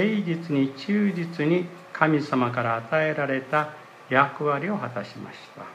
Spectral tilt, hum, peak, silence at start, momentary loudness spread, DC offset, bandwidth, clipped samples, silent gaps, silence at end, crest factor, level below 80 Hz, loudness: -7.5 dB/octave; none; -4 dBFS; 0 s; 13 LU; under 0.1%; 10.5 kHz; under 0.1%; none; 0 s; 20 dB; -74 dBFS; -25 LUFS